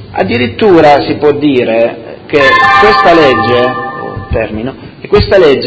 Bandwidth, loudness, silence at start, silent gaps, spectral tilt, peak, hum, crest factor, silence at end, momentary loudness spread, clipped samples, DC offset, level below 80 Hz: 8 kHz; -8 LUFS; 0 s; none; -6.5 dB/octave; 0 dBFS; none; 8 dB; 0 s; 14 LU; 3%; under 0.1%; -28 dBFS